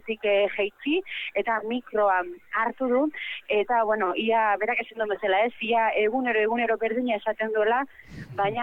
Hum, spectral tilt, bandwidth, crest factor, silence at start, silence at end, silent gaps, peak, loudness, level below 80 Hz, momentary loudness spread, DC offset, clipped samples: none; -6.5 dB/octave; 5.4 kHz; 14 dB; 0.05 s; 0 s; none; -12 dBFS; -25 LUFS; -62 dBFS; 5 LU; under 0.1%; under 0.1%